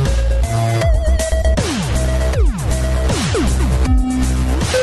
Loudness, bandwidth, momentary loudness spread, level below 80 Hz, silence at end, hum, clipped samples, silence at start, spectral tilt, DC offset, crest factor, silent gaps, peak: -17 LUFS; 12.5 kHz; 2 LU; -16 dBFS; 0 s; none; under 0.1%; 0 s; -5.5 dB/octave; under 0.1%; 10 dB; none; -4 dBFS